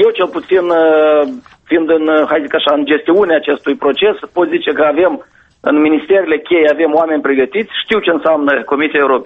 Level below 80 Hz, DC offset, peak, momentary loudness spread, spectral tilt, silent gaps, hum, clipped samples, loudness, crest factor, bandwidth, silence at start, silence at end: -54 dBFS; under 0.1%; 0 dBFS; 5 LU; -6.5 dB/octave; none; none; under 0.1%; -12 LUFS; 12 dB; 5.6 kHz; 0 s; 0 s